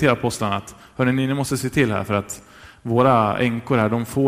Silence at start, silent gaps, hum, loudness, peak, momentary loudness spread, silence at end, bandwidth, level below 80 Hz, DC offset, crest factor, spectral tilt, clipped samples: 0 s; none; none; -20 LUFS; -4 dBFS; 13 LU; 0 s; 16 kHz; -50 dBFS; under 0.1%; 18 dB; -6 dB/octave; under 0.1%